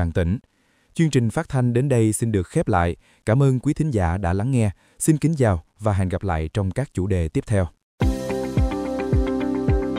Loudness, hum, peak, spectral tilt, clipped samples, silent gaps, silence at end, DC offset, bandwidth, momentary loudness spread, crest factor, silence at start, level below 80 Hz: -22 LUFS; none; -4 dBFS; -7 dB/octave; under 0.1%; 7.83-7.98 s; 0 s; under 0.1%; 15.5 kHz; 6 LU; 18 dB; 0 s; -34 dBFS